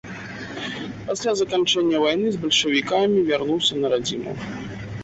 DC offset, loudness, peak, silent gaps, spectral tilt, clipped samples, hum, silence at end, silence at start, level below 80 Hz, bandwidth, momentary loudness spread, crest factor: under 0.1%; -21 LUFS; -8 dBFS; none; -3.5 dB/octave; under 0.1%; none; 0 s; 0.05 s; -54 dBFS; 8.2 kHz; 13 LU; 16 dB